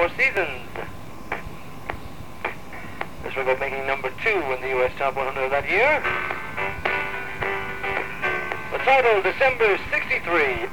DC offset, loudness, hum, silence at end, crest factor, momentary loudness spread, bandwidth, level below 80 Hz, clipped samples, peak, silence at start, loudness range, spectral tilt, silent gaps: 2%; -23 LUFS; none; 0 s; 18 dB; 16 LU; 19 kHz; -48 dBFS; under 0.1%; -6 dBFS; 0 s; 7 LU; -5 dB/octave; none